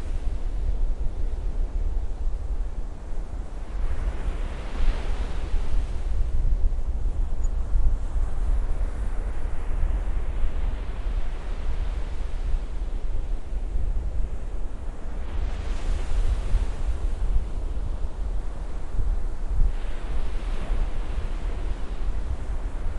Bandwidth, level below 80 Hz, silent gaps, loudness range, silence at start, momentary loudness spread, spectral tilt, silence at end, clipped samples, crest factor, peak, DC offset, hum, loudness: 7.8 kHz; -26 dBFS; none; 3 LU; 0 s; 6 LU; -6.5 dB/octave; 0 s; under 0.1%; 16 dB; -8 dBFS; under 0.1%; none; -32 LUFS